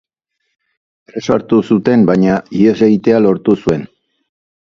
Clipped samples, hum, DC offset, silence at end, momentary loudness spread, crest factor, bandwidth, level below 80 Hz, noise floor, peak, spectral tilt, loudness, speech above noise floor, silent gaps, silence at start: under 0.1%; none; under 0.1%; 0.85 s; 8 LU; 14 dB; 7.4 kHz; -48 dBFS; -71 dBFS; 0 dBFS; -8 dB/octave; -12 LUFS; 60 dB; none; 1.15 s